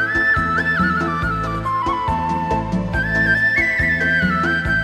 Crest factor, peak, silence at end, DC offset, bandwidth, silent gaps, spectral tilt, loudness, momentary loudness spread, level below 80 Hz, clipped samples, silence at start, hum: 14 dB; -4 dBFS; 0 s; under 0.1%; 14 kHz; none; -6 dB/octave; -17 LUFS; 6 LU; -32 dBFS; under 0.1%; 0 s; none